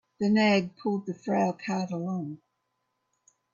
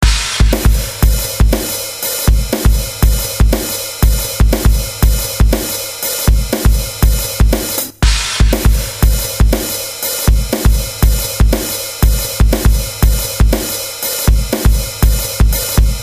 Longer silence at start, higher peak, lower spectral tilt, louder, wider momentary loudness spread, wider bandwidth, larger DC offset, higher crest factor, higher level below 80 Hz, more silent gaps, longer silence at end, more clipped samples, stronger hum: first, 0.2 s vs 0 s; second, -12 dBFS vs 0 dBFS; first, -6.5 dB/octave vs -4 dB/octave; second, -28 LUFS vs -14 LUFS; first, 12 LU vs 4 LU; second, 7.4 kHz vs 16 kHz; second, under 0.1% vs 0.3%; first, 18 dB vs 12 dB; second, -72 dBFS vs -14 dBFS; neither; first, 1.2 s vs 0 s; second, under 0.1% vs 0.3%; neither